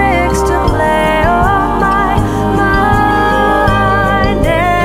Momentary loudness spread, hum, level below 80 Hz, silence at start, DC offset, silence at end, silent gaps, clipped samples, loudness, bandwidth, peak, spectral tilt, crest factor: 2 LU; none; -20 dBFS; 0 s; under 0.1%; 0 s; none; under 0.1%; -11 LUFS; 16.5 kHz; 0 dBFS; -6 dB/octave; 10 dB